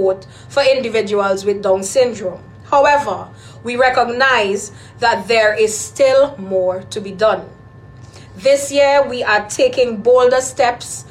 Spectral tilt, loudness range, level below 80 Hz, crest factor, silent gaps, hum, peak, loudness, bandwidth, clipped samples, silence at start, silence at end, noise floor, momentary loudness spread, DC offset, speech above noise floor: -3 dB/octave; 2 LU; -50 dBFS; 14 dB; none; none; -2 dBFS; -15 LUFS; 14.5 kHz; under 0.1%; 0 s; 0 s; -38 dBFS; 12 LU; under 0.1%; 23 dB